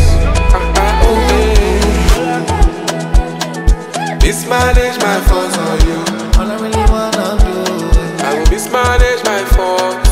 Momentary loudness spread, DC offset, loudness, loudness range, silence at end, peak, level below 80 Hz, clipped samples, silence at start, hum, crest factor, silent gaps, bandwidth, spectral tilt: 5 LU; under 0.1%; -13 LUFS; 2 LU; 0 s; 0 dBFS; -14 dBFS; under 0.1%; 0 s; none; 10 dB; none; 15.5 kHz; -5 dB/octave